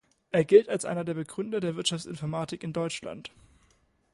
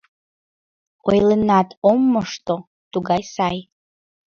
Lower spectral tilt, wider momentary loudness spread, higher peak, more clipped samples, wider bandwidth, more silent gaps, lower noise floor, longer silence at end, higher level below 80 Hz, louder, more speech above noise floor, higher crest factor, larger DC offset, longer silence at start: second, -5 dB/octave vs -6.5 dB/octave; first, 15 LU vs 11 LU; second, -6 dBFS vs -2 dBFS; neither; first, 11.5 kHz vs 7.2 kHz; second, none vs 1.77-1.82 s, 2.67-2.91 s; second, -67 dBFS vs under -90 dBFS; first, 0.85 s vs 0.7 s; second, -66 dBFS vs -52 dBFS; second, -28 LUFS vs -19 LUFS; second, 39 dB vs over 72 dB; about the same, 22 dB vs 18 dB; neither; second, 0.35 s vs 1.05 s